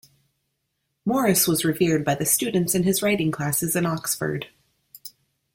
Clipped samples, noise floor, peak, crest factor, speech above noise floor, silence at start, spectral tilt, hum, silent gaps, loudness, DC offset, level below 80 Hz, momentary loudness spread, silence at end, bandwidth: under 0.1%; -76 dBFS; -6 dBFS; 20 dB; 54 dB; 1.05 s; -4 dB/octave; none; none; -22 LUFS; under 0.1%; -58 dBFS; 20 LU; 0.45 s; 16.5 kHz